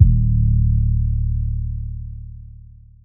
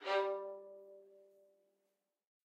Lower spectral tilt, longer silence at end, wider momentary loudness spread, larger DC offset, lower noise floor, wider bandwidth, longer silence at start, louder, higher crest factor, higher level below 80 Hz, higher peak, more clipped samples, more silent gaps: first, -18.5 dB/octave vs -2.5 dB/octave; second, 0.55 s vs 1.2 s; second, 18 LU vs 23 LU; neither; second, -42 dBFS vs -86 dBFS; second, 0.4 kHz vs 9 kHz; about the same, 0 s vs 0 s; first, -20 LUFS vs -40 LUFS; about the same, 18 dB vs 20 dB; first, -22 dBFS vs under -90 dBFS; first, 0 dBFS vs -24 dBFS; neither; neither